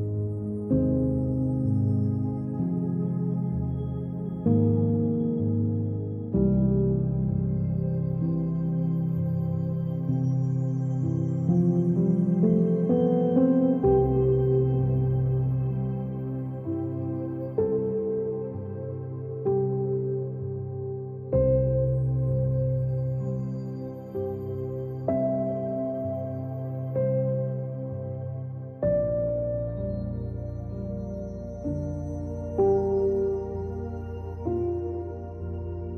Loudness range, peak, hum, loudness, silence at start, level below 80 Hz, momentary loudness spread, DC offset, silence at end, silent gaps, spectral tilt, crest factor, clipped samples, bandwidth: 7 LU; -10 dBFS; none; -27 LUFS; 0 s; -44 dBFS; 11 LU; under 0.1%; 0 s; none; -12.5 dB/octave; 16 dB; under 0.1%; 3.3 kHz